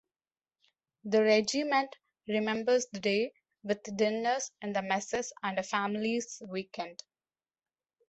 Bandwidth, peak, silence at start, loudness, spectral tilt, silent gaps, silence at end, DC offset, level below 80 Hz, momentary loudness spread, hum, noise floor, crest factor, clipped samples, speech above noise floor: 8.2 kHz; -14 dBFS; 1.05 s; -31 LUFS; -3.5 dB/octave; none; 1.15 s; under 0.1%; -74 dBFS; 13 LU; none; under -90 dBFS; 20 dB; under 0.1%; over 59 dB